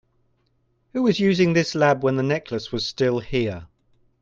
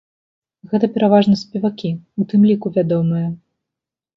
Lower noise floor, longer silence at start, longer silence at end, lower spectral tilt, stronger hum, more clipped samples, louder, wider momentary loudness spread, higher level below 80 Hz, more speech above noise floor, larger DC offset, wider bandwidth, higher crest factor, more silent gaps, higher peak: second, -67 dBFS vs -85 dBFS; first, 0.95 s vs 0.7 s; second, 0.55 s vs 0.8 s; second, -6 dB/octave vs -8.5 dB/octave; neither; neither; second, -22 LUFS vs -17 LUFS; about the same, 10 LU vs 11 LU; first, -52 dBFS vs -58 dBFS; second, 46 dB vs 69 dB; neither; first, 7.6 kHz vs 6.4 kHz; about the same, 18 dB vs 16 dB; neither; second, -6 dBFS vs 0 dBFS